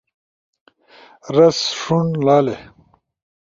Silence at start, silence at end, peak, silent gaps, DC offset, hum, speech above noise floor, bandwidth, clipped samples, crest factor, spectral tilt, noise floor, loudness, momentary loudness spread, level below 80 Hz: 1.25 s; 0.8 s; -2 dBFS; none; under 0.1%; none; 32 dB; 7.6 kHz; under 0.1%; 18 dB; -5.5 dB/octave; -48 dBFS; -16 LUFS; 8 LU; -58 dBFS